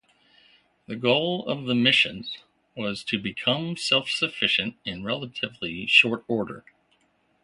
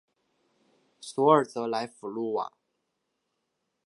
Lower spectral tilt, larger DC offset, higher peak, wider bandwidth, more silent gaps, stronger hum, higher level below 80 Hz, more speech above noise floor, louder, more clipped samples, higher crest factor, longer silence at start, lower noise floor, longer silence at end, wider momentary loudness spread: second, -4 dB/octave vs -6 dB/octave; neither; about the same, -4 dBFS vs -6 dBFS; about the same, 11.5 kHz vs 11.5 kHz; neither; neither; first, -62 dBFS vs -84 dBFS; second, 42 dB vs 53 dB; first, -23 LUFS vs -27 LUFS; neither; about the same, 24 dB vs 24 dB; about the same, 0.9 s vs 1 s; second, -67 dBFS vs -80 dBFS; second, 0.85 s vs 1.4 s; about the same, 17 LU vs 16 LU